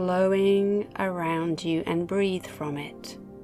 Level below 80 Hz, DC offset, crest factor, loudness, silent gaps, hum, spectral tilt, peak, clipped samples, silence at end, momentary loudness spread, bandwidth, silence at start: -58 dBFS; under 0.1%; 14 dB; -26 LUFS; none; none; -6.5 dB/octave; -12 dBFS; under 0.1%; 0 s; 13 LU; 13.5 kHz; 0 s